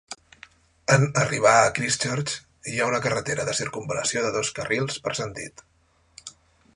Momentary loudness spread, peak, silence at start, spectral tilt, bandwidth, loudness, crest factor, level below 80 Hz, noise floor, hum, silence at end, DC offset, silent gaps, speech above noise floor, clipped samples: 21 LU; -2 dBFS; 0.1 s; -3.5 dB/octave; 11.5 kHz; -24 LUFS; 22 dB; -58 dBFS; -63 dBFS; none; 0.45 s; under 0.1%; none; 40 dB; under 0.1%